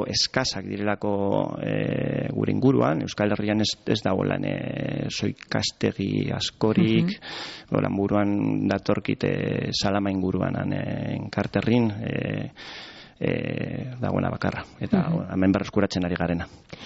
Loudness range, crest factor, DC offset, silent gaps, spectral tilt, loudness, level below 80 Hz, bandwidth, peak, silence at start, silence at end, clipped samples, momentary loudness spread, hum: 3 LU; 18 dB; under 0.1%; none; -5.5 dB/octave; -25 LUFS; -52 dBFS; 8 kHz; -8 dBFS; 0 s; 0 s; under 0.1%; 8 LU; none